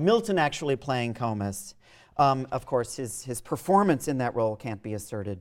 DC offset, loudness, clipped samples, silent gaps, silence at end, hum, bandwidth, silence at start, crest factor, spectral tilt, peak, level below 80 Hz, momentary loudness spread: under 0.1%; -28 LUFS; under 0.1%; none; 0 s; none; 16.5 kHz; 0 s; 18 dB; -5.5 dB/octave; -8 dBFS; -58 dBFS; 12 LU